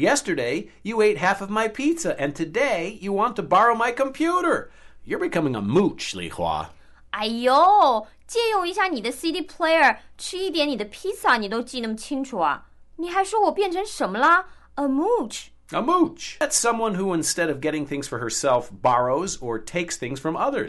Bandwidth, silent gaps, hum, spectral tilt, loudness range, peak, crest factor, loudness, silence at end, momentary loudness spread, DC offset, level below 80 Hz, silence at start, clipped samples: 12 kHz; none; none; -3.5 dB/octave; 3 LU; -6 dBFS; 16 dB; -23 LUFS; 0 s; 11 LU; under 0.1%; -52 dBFS; 0 s; under 0.1%